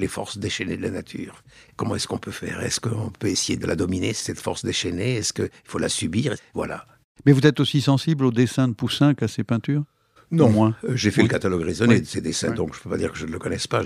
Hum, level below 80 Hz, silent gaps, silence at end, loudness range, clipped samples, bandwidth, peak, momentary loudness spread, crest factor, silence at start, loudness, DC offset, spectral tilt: none; -52 dBFS; 7.04-7.15 s; 0 s; 6 LU; under 0.1%; 14.5 kHz; -2 dBFS; 11 LU; 20 dB; 0 s; -23 LUFS; under 0.1%; -5 dB/octave